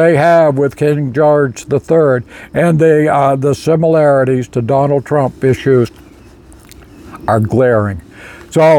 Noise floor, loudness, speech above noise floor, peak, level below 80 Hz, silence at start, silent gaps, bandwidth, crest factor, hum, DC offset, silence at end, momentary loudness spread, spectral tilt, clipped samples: -38 dBFS; -12 LUFS; 27 dB; 0 dBFS; -44 dBFS; 0 s; none; 17 kHz; 12 dB; none; under 0.1%; 0 s; 8 LU; -7.5 dB/octave; under 0.1%